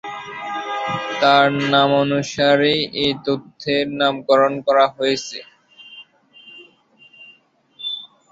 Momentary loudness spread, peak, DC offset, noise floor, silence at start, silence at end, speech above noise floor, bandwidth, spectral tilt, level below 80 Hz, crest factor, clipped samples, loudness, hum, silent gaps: 15 LU; -2 dBFS; under 0.1%; -54 dBFS; 0.05 s; 0.25 s; 36 dB; 7.8 kHz; -4.5 dB/octave; -60 dBFS; 18 dB; under 0.1%; -18 LUFS; none; none